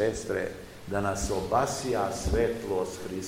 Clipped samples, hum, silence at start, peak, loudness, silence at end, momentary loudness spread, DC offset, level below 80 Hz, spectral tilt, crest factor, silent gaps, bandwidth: under 0.1%; none; 0 s; -12 dBFS; -30 LUFS; 0 s; 7 LU; 0.2%; -42 dBFS; -5 dB/octave; 18 dB; none; 16 kHz